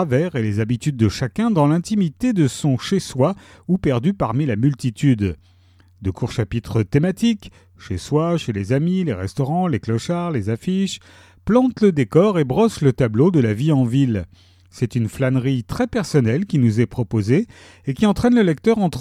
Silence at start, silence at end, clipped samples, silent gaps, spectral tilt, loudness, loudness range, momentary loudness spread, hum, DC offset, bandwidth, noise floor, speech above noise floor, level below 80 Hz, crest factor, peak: 0 s; 0 s; under 0.1%; none; -7.5 dB/octave; -19 LUFS; 4 LU; 8 LU; none; under 0.1%; 14 kHz; -52 dBFS; 33 dB; -46 dBFS; 16 dB; -2 dBFS